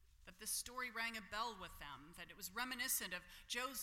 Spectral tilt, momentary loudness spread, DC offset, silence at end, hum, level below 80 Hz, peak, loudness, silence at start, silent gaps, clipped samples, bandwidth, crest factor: -0.5 dB/octave; 14 LU; under 0.1%; 0 s; none; -68 dBFS; -28 dBFS; -45 LUFS; 0 s; none; under 0.1%; 16.5 kHz; 18 dB